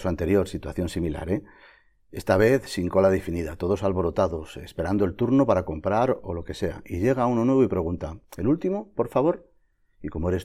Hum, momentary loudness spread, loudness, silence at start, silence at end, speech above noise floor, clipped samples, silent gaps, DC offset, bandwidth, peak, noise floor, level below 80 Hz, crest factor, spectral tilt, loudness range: none; 12 LU; -25 LUFS; 0 s; 0 s; 39 dB; under 0.1%; none; under 0.1%; 15.5 kHz; -6 dBFS; -63 dBFS; -44 dBFS; 18 dB; -7.5 dB/octave; 1 LU